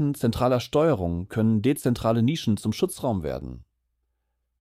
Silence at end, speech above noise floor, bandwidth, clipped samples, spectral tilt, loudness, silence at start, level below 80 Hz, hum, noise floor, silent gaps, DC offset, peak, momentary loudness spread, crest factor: 1 s; 53 dB; 15.5 kHz; under 0.1%; -7 dB/octave; -24 LUFS; 0 s; -46 dBFS; none; -76 dBFS; none; under 0.1%; -10 dBFS; 7 LU; 14 dB